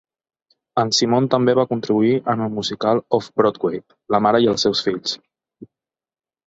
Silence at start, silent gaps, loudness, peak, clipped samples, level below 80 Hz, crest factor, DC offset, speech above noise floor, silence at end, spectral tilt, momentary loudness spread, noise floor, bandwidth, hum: 0.75 s; none; -19 LUFS; -2 dBFS; under 0.1%; -58 dBFS; 18 dB; under 0.1%; over 72 dB; 0.85 s; -5 dB/octave; 9 LU; under -90 dBFS; 8 kHz; none